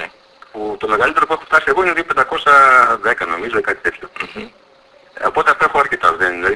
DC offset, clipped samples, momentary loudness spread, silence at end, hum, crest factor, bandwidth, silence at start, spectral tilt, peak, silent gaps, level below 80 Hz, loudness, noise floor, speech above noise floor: under 0.1%; under 0.1%; 18 LU; 0 s; none; 16 dB; 11 kHz; 0 s; -3.5 dB/octave; 0 dBFS; none; -48 dBFS; -14 LUFS; -48 dBFS; 33 dB